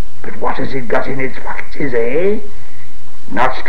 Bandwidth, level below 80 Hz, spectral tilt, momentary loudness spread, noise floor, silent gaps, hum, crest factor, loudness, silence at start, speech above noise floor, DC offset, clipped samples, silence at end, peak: 16.5 kHz; -38 dBFS; -7 dB/octave; 12 LU; -40 dBFS; none; none; 20 dB; -20 LUFS; 0 s; 21 dB; 50%; under 0.1%; 0 s; 0 dBFS